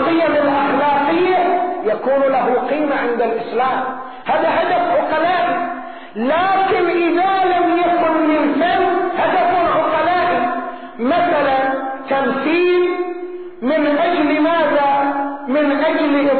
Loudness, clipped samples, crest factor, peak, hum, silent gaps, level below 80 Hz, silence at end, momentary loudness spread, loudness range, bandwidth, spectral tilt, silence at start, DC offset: -16 LUFS; under 0.1%; 10 dB; -6 dBFS; none; none; -56 dBFS; 0 s; 7 LU; 2 LU; 4.5 kHz; -9 dB/octave; 0 s; 0.9%